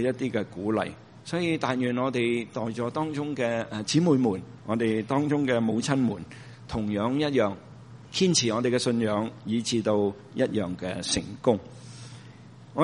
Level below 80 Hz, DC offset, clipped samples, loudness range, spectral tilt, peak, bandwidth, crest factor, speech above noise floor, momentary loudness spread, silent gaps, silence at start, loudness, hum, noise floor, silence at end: -58 dBFS; under 0.1%; under 0.1%; 3 LU; -5 dB/octave; -8 dBFS; 10.5 kHz; 20 dB; 21 dB; 15 LU; none; 0 s; -27 LUFS; none; -48 dBFS; 0 s